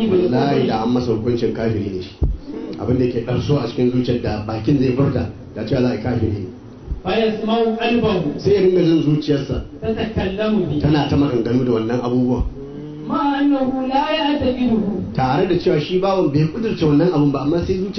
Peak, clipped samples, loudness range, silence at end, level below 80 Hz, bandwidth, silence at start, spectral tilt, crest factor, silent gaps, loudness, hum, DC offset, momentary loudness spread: -6 dBFS; under 0.1%; 3 LU; 0 s; -36 dBFS; 6.4 kHz; 0 s; -8 dB/octave; 12 dB; none; -18 LUFS; none; under 0.1%; 8 LU